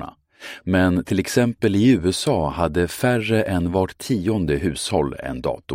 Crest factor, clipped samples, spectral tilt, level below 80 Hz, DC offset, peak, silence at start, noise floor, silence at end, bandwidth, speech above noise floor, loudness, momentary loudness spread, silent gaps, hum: 16 dB; under 0.1%; -6 dB/octave; -42 dBFS; under 0.1%; -4 dBFS; 0 s; -40 dBFS; 0 s; 16.5 kHz; 20 dB; -21 LUFS; 9 LU; none; none